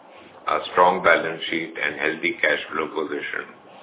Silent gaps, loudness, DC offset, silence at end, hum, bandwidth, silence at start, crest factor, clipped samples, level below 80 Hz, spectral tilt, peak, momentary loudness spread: none; -22 LUFS; under 0.1%; 0 s; none; 4 kHz; 0.1 s; 22 dB; under 0.1%; -62 dBFS; -7.5 dB/octave; -2 dBFS; 11 LU